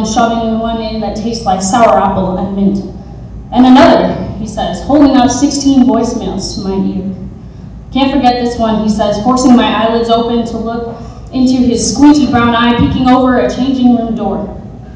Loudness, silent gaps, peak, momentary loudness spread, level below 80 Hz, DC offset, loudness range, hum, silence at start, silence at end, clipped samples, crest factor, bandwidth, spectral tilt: -10 LUFS; none; 0 dBFS; 14 LU; -30 dBFS; under 0.1%; 4 LU; none; 0 s; 0 s; 2%; 10 dB; 8 kHz; -5.5 dB/octave